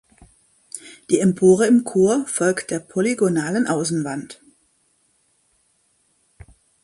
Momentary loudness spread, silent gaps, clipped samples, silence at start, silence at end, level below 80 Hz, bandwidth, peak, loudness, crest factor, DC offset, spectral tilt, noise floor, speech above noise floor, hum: 20 LU; none; under 0.1%; 0.75 s; 2.5 s; -60 dBFS; 11.5 kHz; -2 dBFS; -19 LUFS; 18 dB; under 0.1%; -5.5 dB/octave; -64 dBFS; 46 dB; none